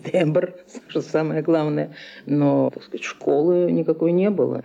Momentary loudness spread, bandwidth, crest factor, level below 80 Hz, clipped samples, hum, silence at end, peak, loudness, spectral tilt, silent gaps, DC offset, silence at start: 12 LU; 9.4 kHz; 14 dB; -72 dBFS; under 0.1%; none; 0 s; -8 dBFS; -21 LUFS; -8 dB/octave; none; under 0.1%; 0.05 s